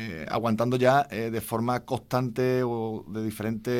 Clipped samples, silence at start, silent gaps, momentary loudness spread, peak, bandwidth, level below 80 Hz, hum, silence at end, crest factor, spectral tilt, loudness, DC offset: under 0.1%; 0 s; none; 9 LU; -8 dBFS; 16.5 kHz; -58 dBFS; none; 0 s; 20 dB; -6.5 dB/octave; -27 LUFS; under 0.1%